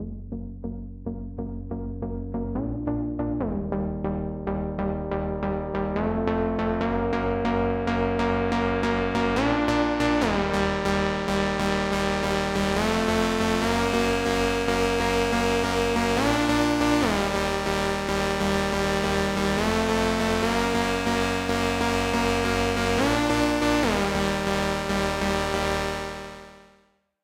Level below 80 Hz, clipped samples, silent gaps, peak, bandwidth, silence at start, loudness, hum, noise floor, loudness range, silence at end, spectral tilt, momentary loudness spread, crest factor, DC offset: -38 dBFS; under 0.1%; none; -6 dBFS; 16 kHz; 0 s; -25 LUFS; none; -63 dBFS; 6 LU; 0.65 s; -5 dB/octave; 9 LU; 18 dB; under 0.1%